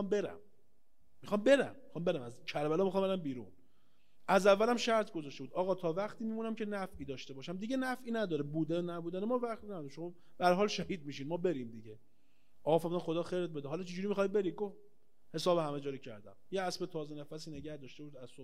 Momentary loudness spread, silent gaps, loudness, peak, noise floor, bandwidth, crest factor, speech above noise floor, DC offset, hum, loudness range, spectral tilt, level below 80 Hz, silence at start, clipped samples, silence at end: 16 LU; none; -35 LUFS; -14 dBFS; -77 dBFS; 15.5 kHz; 22 dB; 41 dB; 0.3%; none; 5 LU; -5.5 dB/octave; -72 dBFS; 0 s; under 0.1%; 0 s